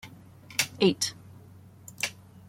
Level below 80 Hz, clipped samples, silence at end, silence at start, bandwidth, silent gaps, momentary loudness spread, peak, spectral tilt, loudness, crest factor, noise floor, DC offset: -68 dBFS; under 0.1%; 0.35 s; 0.05 s; 16.5 kHz; none; 24 LU; -8 dBFS; -3 dB/octave; -28 LUFS; 24 dB; -51 dBFS; under 0.1%